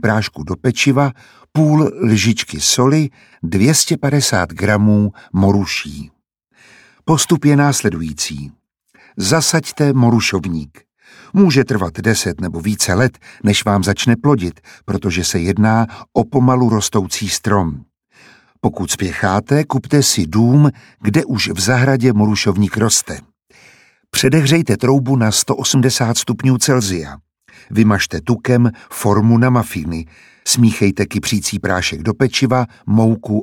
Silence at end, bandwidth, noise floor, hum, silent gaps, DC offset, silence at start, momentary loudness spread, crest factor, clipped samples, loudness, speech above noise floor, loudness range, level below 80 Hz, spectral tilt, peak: 0 s; 17 kHz; -54 dBFS; none; none; under 0.1%; 0.05 s; 9 LU; 16 dB; under 0.1%; -15 LUFS; 40 dB; 3 LU; -44 dBFS; -5 dB/octave; 0 dBFS